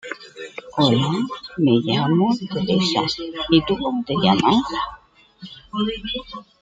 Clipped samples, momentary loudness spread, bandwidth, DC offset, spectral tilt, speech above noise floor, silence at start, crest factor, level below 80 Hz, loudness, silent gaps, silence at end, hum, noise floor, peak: under 0.1%; 16 LU; 9 kHz; under 0.1%; -6 dB/octave; 24 dB; 0.05 s; 18 dB; -50 dBFS; -20 LUFS; none; 0.2 s; none; -44 dBFS; -2 dBFS